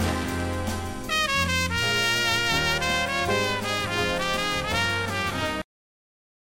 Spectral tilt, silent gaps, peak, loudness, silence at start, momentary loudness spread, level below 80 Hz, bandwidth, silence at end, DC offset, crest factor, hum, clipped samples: -3 dB/octave; none; -10 dBFS; -24 LUFS; 0 s; 7 LU; -42 dBFS; 16.5 kHz; 0.85 s; under 0.1%; 16 dB; none; under 0.1%